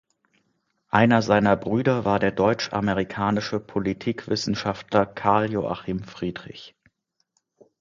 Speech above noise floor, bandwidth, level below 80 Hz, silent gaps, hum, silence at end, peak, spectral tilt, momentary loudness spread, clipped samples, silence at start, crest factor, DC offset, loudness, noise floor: 49 dB; 7.6 kHz; -52 dBFS; none; none; 1.15 s; -2 dBFS; -6 dB/octave; 13 LU; under 0.1%; 0.95 s; 22 dB; under 0.1%; -23 LUFS; -72 dBFS